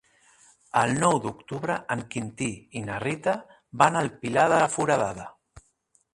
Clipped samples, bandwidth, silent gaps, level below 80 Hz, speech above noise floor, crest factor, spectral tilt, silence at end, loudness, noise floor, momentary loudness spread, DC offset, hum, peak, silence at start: under 0.1%; 11.5 kHz; none; -60 dBFS; 43 dB; 22 dB; -4.5 dB/octave; 0.85 s; -26 LUFS; -68 dBFS; 12 LU; under 0.1%; none; -4 dBFS; 0.75 s